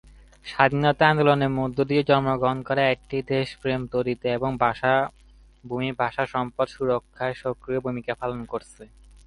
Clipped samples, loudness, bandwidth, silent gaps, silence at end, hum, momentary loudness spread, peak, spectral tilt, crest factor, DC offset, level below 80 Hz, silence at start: under 0.1%; -24 LUFS; 11.5 kHz; none; 0.4 s; none; 11 LU; -2 dBFS; -7 dB/octave; 22 dB; under 0.1%; -52 dBFS; 0.45 s